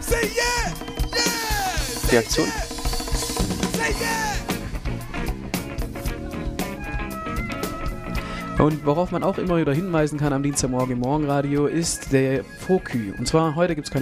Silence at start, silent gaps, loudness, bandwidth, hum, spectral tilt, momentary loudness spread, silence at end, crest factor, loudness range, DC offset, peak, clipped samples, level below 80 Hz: 0 s; none; -24 LUFS; 15.5 kHz; none; -4.5 dB/octave; 9 LU; 0 s; 20 dB; 7 LU; under 0.1%; -4 dBFS; under 0.1%; -32 dBFS